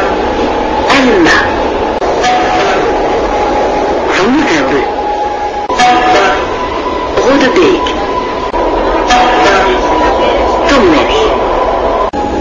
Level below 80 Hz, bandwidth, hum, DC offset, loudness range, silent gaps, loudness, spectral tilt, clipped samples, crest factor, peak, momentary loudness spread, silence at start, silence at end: -26 dBFS; 10 kHz; none; under 0.1%; 2 LU; none; -10 LUFS; -4 dB/octave; under 0.1%; 10 dB; 0 dBFS; 7 LU; 0 s; 0 s